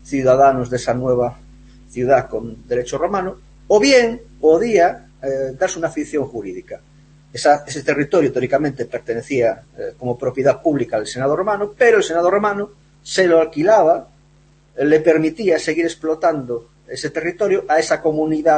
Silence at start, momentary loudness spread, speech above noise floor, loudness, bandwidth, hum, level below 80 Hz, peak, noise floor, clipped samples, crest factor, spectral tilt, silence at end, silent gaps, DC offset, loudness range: 0.05 s; 14 LU; 35 dB; -17 LUFS; 8.8 kHz; none; -48 dBFS; -2 dBFS; -51 dBFS; under 0.1%; 16 dB; -5 dB/octave; 0 s; none; under 0.1%; 4 LU